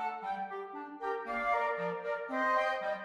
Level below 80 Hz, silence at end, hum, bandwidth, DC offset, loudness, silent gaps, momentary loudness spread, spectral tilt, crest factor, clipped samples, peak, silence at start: -70 dBFS; 0 s; none; 12 kHz; under 0.1%; -34 LUFS; none; 10 LU; -5 dB/octave; 16 dB; under 0.1%; -18 dBFS; 0 s